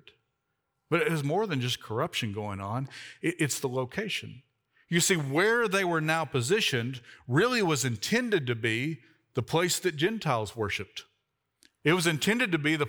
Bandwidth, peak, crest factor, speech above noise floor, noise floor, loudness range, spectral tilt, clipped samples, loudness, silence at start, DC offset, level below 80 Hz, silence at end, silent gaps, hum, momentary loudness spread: over 20 kHz; -10 dBFS; 20 dB; 52 dB; -80 dBFS; 5 LU; -4 dB/octave; under 0.1%; -28 LUFS; 0.9 s; under 0.1%; -68 dBFS; 0 s; none; none; 10 LU